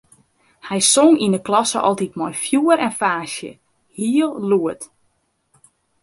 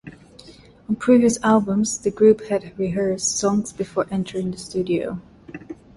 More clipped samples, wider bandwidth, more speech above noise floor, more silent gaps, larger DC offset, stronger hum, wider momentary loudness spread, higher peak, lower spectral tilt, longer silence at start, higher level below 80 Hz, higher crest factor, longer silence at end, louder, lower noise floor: neither; about the same, 11.5 kHz vs 11.5 kHz; first, 49 dB vs 26 dB; neither; neither; neither; about the same, 15 LU vs 15 LU; about the same, -2 dBFS vs -4 dBFS; second, -3.5 dB/octave vs -5 dB/octave; first, 0.65 s vs 0.05 s; second, -64 dBFS vs -54 dBFS; about the same, 18 dB vs 18 dB; first, 1.15 s vs 0.25 s; first, -18 LUFS vs -21 LUFS; first, -66 dBFS vs -46 dBFS